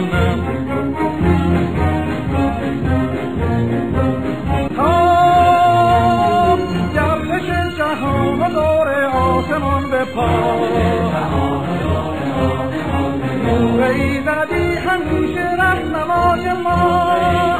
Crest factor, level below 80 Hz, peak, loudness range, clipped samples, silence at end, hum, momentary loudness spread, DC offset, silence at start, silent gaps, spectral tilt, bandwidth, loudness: 14 dB; -32 dBFS; -2 dBFS; 4 LU; under 0.1%; 0 s; none; 7 LU; 1%; 0 s; none; -7 dB/octave; 15.5 kHz; -16 LUFS